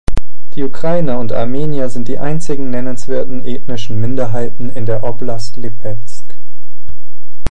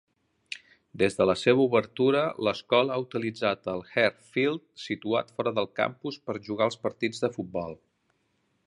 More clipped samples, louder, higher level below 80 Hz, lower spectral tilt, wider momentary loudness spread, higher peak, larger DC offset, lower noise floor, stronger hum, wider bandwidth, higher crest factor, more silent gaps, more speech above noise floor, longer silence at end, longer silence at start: first, 1% vs under 0.1%; first, -21 LUFS vs -27 LUFS; first, -32 dBFS vs -64 dBFS; first, -7 dB/octave vs -5.5 dB/octave; about the same, 10 LU vs 12 LU; first, 0 dBFS vs -8 dBFS; first, 70% vs under 0.1%; second, -51 dBFS vs -73 dBFS; neither; about the same, 11.5 kHz vs 11 kHz; about the same, 16 dB vs 20 dB; neither; second, 31 dB vs 46 dB; second, 0 s vs 0.95 s; second, 0.05 s vs 0.5 s